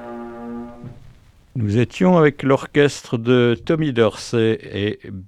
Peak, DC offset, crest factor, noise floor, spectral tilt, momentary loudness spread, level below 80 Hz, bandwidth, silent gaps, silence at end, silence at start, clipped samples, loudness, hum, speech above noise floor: -2 dBFS; under 0.1%; 18 dB; -47 dBFS; -6.5 dB/octave; 17 LU; -50 dBFS; 12 kHz; none; 0 s; 0 s; under 0.1%; -18 LUFS; none; 29 dB